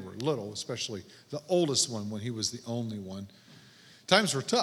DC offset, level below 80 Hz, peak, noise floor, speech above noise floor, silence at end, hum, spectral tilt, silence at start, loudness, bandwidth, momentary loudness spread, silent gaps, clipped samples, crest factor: under 0.1%; -74 dBFS; -4 dBFS; -56 dBFS; 25 dB; 0 s; none; -3.5 dB/octave; 0 s; -30 LUFS; 17 kHz; 17 LU; none; under 0.1%; 28 dB